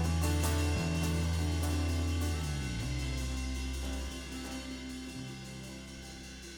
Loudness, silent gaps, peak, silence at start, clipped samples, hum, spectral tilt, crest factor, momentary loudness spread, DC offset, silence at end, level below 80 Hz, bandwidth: -35 LUFS; none; -18 dBFS; 0 s; under 0.1%; none; -5 dB/octave; 16 dB; 13 LU; under 0.1%; 0 s; -42 dBFS; 20 kHz